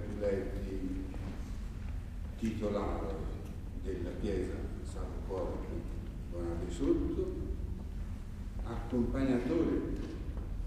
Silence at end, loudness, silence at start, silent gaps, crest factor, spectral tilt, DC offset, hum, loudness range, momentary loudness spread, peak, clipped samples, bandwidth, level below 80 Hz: 0 s; -38 LUFS; 0 s; none; 18 dB; -8 dB/octave; under 0.1%; none; 4 LU; 11 LU; -18 dBFS; under 0.1%; 13.5 kHz; -40 dBFS